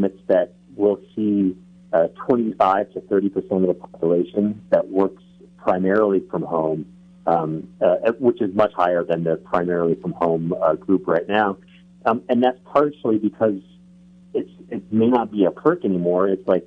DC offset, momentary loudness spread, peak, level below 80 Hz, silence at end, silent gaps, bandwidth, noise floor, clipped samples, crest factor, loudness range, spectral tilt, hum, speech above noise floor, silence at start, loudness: under 0.1%; 7 LU; -4 dBFS; -60 dBFS; 0.05 s; none; 6.4 kHz; -48 dBFS; under 0.1%; 16 dB; 1 LU; -9 dB/octave; none; 28 dB; 0 s; -21 LUFS